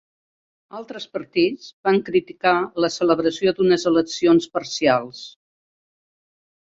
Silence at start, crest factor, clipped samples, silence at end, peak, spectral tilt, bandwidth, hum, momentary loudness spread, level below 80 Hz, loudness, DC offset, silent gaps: 0.75 s; 18 dB; under 0.1%; 1.4 s; -4 dBFS; -5 dB/octave; 7.8 kHz; none; 17 LU; -62 dBFS; -20 LUFS; under 0.1%; 1.73-1.84 s